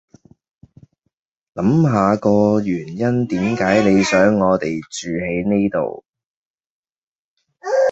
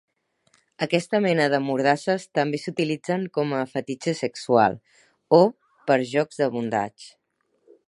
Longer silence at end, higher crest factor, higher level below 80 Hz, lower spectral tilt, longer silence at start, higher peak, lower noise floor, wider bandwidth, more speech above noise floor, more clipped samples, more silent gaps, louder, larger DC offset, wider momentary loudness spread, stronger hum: second, 0 s vs 0.8 s; about the same, 18 dB vs 22 dB; first, -50 dBFS vs -70 dBFS; about the same, -6.5 dB/octave vs -6 dB/octave; first, 1.55 s vs 0.8 s; about the same, -2 dBFS vs -2 dBFS; about the same, -73 dBFS vs -71 dBFS; second, 8 kHz vs 11.5 kHz; first, 57 dB vs 49 dB; neither; first, 6.09-6.13 s, 6.26-6.54 s, 6.66-6.83 s, 6.96-7.37 s vs none; first, -17 LUFS vs -23 LUFS; neither; first, 11 LU vs 8 LU; neither